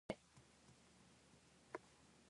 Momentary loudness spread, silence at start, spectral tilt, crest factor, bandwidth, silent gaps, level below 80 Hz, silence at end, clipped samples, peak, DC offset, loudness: 15 LU; 0.1 s; -5 dB/octave; 32 dB; 11 kHz; none; -78 dBFS; 0 s; under 0.1%; -28 dBFS; under 0.1%; -61 LUFS